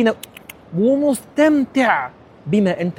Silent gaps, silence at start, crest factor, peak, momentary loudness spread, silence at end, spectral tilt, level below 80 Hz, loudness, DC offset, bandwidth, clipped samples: none; 0 s; 16 dB; -2 dBFS; 16 LU; 0.05 s; -6 dB/octave; -56 dBFS; -18 LUFS; under 0.1%; 17 kHz; under 0.1%